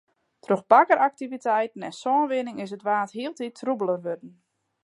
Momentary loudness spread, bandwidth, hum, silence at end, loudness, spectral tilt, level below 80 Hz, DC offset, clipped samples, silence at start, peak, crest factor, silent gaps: 14 LU; 11 kHz; none; 0.55 s; -24 LUFS; -5.5 dB/octave; -82 dBFS; under 0.1%; under 0.1%; 0.5 s; -4 dBFS; 22 dB; none